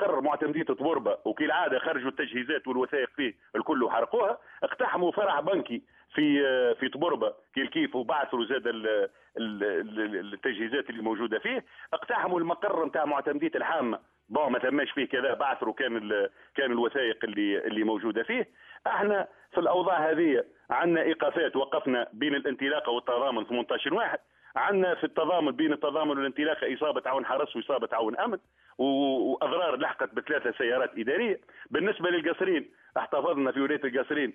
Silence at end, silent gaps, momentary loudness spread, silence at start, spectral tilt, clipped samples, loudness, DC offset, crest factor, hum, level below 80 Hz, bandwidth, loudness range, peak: 0 s; none; 6 LU; 0 s; -7.5 dB/octave; under 0.1%; -29 LUFS; under 0.1%; 16 dB; none; -74 dBFS; 3.7 kHz; 3 LU; -12 dBFS